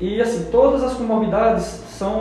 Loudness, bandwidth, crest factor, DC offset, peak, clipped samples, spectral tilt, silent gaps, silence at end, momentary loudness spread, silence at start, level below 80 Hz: -19 LUFS; 12.5 kHz; 14 dB; under 0.1%; -4 dBFS; under 0.1%; -6.5 dB/octave; none; 0 s; 9 LU; 0 s; -38 dBFS